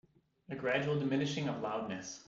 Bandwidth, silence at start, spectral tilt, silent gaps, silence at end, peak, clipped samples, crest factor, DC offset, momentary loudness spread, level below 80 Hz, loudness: 7.8 kHz; 0.5 s; -5.5 dB/octave; none; 0.05 s; -18 dBFS; under 0.1%; 18 dB; under 0.1%; 8 LU; -72 dBFS; -36 LUFS